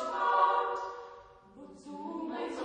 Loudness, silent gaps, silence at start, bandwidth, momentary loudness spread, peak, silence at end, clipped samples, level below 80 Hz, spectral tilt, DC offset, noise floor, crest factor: -31 LUFS; none; 0 s; 9.6 kHz; 24 LU; -12 dBFS; 0 s; under 0.1%; -72 dBFS; -4 dB/octave; under 0.1%; -53 dBFS; 20 dB